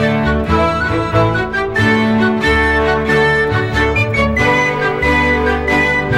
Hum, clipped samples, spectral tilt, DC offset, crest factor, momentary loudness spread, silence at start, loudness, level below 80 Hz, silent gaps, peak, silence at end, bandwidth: none; under 0.1%; -6 dB/octave; under 0.1%; 12 dB; 3 LU; 0 s; -13 LUFS; -26 dBFS; none; 0 dBFS; 0 s; 14.5 kHz